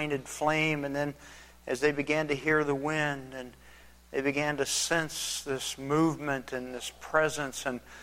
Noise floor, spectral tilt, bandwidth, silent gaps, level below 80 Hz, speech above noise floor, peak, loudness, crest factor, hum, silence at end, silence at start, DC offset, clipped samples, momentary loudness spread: -54 dBFS; -3.5 dB/octave; 16.5 kHz; none; -60 dBFS; 23 dB; -10 dBFS; -30 LUFS; 20 dB; none; 0 s; 0 s; under 0.1%; under 0.1%; 11 LU